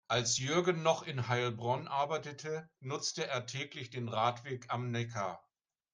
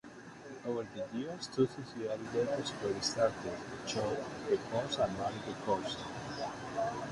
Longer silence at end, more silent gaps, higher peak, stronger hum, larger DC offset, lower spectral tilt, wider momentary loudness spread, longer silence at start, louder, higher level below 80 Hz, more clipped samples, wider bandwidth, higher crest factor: first, 0.55 s vs 0 s; neither; first, -14 dBFS vs -18 dBFS; neither; neither; about the same, -4 dB/octave vs -4.5 dB/octave; first, 11 LU vs 8 LU; about the same, 0.1 s vs 0.05 s; about the same, -35 LUFS vs -37 LUFS; second, -74 dBFS vs -64 dBFS; neither; about the same, 10.5 kHz vs 11.5 kHz; about the same, 22 dB vs 20 dB